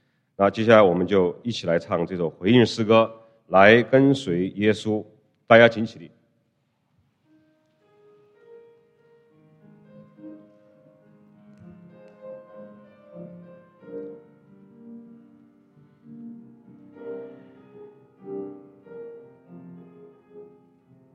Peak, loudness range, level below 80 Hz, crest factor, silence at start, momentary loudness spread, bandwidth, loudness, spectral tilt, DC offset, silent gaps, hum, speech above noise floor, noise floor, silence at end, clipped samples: 0 dBFS; 25 LU; -66 dBFS; 24 dB; 0.4 s; 28 LU; 9.6 kHz; -19 LUFS; -6.5 dB/octave; under 0.1%; none; none; 52 dB; -70 dBFS; 0.75 s; under 0.1%